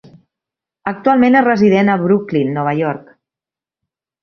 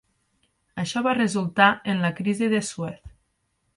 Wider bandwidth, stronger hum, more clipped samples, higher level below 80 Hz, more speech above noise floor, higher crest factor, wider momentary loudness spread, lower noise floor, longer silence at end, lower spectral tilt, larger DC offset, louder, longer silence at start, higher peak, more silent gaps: second, 6.6 kHz vs 11.5 kHz; neither; neither; about the same, -58 dBFS vs -58 dBFS; first, 76 dB vs 50 dB; second, 14 dB vs 22 dB; about the same, 13 LU vs 15 LU; first, -89 dBFS vs -72 dBFS; first, 1.25 s vs 0.7 s; first, -8.5 dB/octave vs -5 dB/octave; neither; first, -14 LUFS vs -23 LUFS; about the same, 0.85 s vs 0.75 s; about the same, -2 dBFS vs -4 dBFS; neither